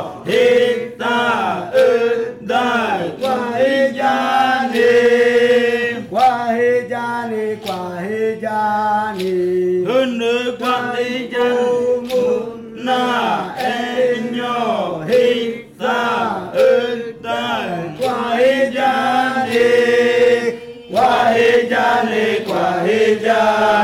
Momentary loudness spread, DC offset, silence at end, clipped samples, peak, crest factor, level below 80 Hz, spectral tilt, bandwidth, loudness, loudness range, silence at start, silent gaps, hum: 8 LU; under 0.1%; 0 s; under 0.1%; -6 dBFS; 10 dB; -58 dBFS; -4.5 dB/octave; 15.5 kHz; -16 LUFS; 4 LU; 0 s; none; none